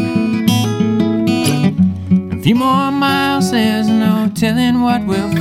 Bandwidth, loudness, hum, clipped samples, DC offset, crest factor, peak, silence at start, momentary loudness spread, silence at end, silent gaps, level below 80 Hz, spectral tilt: 16 kHz; -14 LUFS; none; under 0.1%; under 0.1%; 12 dB; 0 dBFS; 0 s; 3 LU; 0 s; none; -44 dBFS; -6 dB/octave